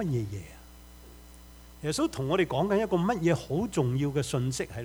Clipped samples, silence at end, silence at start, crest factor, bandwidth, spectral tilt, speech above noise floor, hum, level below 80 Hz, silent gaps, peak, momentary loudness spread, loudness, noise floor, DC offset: under 0.1%; 0 s; 0 s; 18 dB; over 20 kHz; -6 dB/octave; 22 dB; 60 Hz at -50 dBFS; -52 dBFS; none; -12 dBFS; 9 LU; -29 LUFS; -50 dBFS; under 0.1%